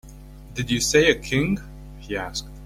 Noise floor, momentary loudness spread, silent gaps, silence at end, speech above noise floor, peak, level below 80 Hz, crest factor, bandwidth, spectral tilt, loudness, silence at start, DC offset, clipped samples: -41 dBFS; 19 LU; none; 0 s; 20 dB; -4 dBFS; -40 dBFS; 20 dB; 16.5 kHz; -4 dB/octave; -22 LUFS; 0.05 s; under 0.1%; under 0.1%